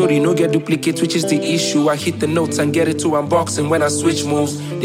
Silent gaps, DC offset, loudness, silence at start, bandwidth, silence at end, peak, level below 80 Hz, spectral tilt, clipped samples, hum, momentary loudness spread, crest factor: none; under 0.1%; -17 LUFS; 0 s; 16.5 kHz; 0 s; -2 dBFS; -58 dBFS; -5 dB/octave; under 0.1%; none; 3 LU; 14 dB